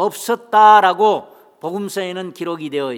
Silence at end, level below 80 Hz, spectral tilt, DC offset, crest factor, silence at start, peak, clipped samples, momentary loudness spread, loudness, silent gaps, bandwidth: 0 s; -80 dBFS; -4 dB/octave; under 0.1%; 16 dB; 0 s; 0 dBFS; under 0.1%; 16 LU; -15 LUFS; none; 18.5 kHz